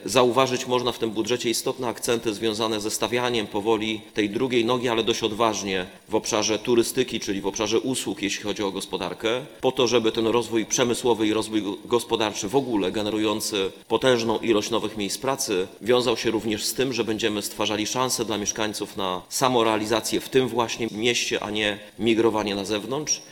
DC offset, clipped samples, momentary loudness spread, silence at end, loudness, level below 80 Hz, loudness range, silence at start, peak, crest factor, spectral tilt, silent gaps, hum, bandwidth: under 0.1%; under 0.1%; 6 LU; 0 s; -24 LUFS; -56 dBFS; 2 LU; 0 s; 0 dBFS; 24 dB; -3.5 dB/octave; none; none; 19 kHz